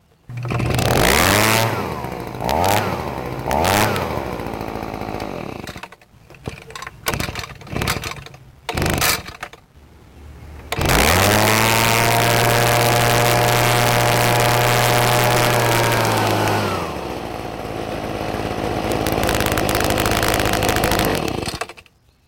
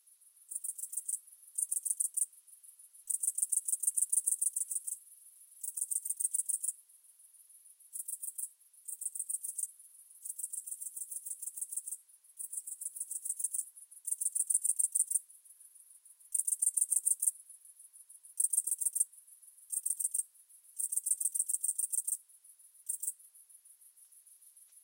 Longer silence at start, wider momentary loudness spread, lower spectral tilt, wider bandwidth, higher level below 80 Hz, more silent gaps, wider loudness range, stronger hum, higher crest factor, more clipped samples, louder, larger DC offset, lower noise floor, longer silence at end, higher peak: second, 0.3 s vs 0.5 s; about the same, 16 LU vs 18 LU; first, -4 dB/octave vs 7.5 dB/octave; about the same, 17.5 kHz vs 17 kHz; first, -34 dBFS vs under -90 dBFS; neither; first, 12 LU vs 8 LU; neither; second, 16 dB vs 26 dB; neither; first, -18 LUFS vs -33 LUFS; neither; second, -49 dBFS vs -63 dBFS; first, 0.45 s vs 0.05 s; first, -4 dBFS vs -12 dBFS